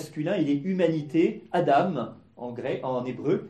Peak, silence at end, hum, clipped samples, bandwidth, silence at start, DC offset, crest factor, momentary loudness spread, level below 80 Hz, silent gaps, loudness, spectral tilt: -10 dBFS; 0 s; none; under 0.1%; 12.5 kHz; 0 s; under 0.1%; 16 dB; 11 LU; -70 dBFS; none; -26 LUFS; -7.5 dB/octave